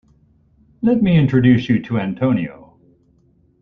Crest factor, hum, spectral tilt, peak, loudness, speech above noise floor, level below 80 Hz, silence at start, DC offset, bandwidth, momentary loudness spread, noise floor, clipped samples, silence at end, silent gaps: 16 dB; none; -9.5 dB/octave; -2 dBFS; -17 LUFS; 41 dB; -46 dBFS; 0.8 s; under 0.1%; 6.2 kHz; 9 LU; -56 dBFS; under 0.1%; 1.1 s; none